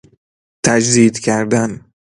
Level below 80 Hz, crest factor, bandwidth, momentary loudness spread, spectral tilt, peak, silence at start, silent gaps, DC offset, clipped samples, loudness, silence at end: -52 dBFS; 16 dB; 11.5 kHz; 10 LU; -4.5 dB/octave; 0 dBFS; 0.65 s; none; under 0.1%; under 0.1%; -14 LUFS; 0.45 s